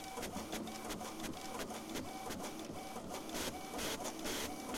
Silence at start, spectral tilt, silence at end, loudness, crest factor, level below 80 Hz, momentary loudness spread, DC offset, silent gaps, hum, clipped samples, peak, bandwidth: 0 s; -3 dB/octave; 0 s; -43 LUFS; 18 dB; -60 dBFS; 5 LU; under 0.1%; none; none; under 0.1%; -26 dBFS; 16.5 kHz